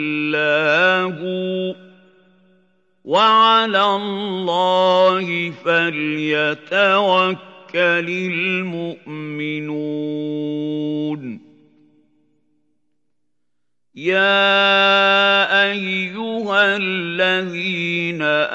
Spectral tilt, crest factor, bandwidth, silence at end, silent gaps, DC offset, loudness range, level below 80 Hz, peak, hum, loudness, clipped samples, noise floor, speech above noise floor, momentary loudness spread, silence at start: -5 dB/octave; 16 dB; 8 kHz; 0 s; none; under 0.1%; 11 LU; -82 dBFS; -2 dBFS; none; -17 LUFS; under 0.1%; -80 dBFS; 62 dB; 12 LU; 0 s